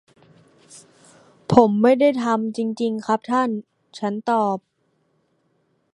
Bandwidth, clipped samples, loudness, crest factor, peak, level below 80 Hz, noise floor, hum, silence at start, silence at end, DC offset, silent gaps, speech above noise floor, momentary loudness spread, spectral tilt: 11 kHz; under 0.1%; -20 LUFS; 22 dB; 0 dBFS; -60 dBFS; -67 dBFS; none; 0.75 s; 1.35 s; under 0.1%; none; 48 dB; 14 LU; -7 dB/octave